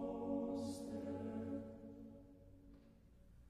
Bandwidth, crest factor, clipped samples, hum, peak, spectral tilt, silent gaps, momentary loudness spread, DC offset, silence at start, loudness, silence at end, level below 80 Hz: 14 kHz; 16 dB; under 0.1%; none; -32 dBFS; -7 dB/octave; none; 23 LU; under 0.1%; 0 s; -46 LUFS; 0 s; -68 dBFS